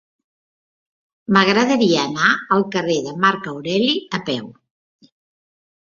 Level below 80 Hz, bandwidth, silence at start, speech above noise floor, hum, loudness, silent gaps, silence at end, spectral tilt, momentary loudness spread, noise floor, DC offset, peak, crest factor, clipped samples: -62 dBFS; 7.4 kHz; 1.3 s; over 72 dB; none; -18 LUFS; none; 1.45 s; -4.5 dB/octave; 10 LU; under -90 dBFS; under 0.1%; -2 dBFS; 18 dB; under 0.1%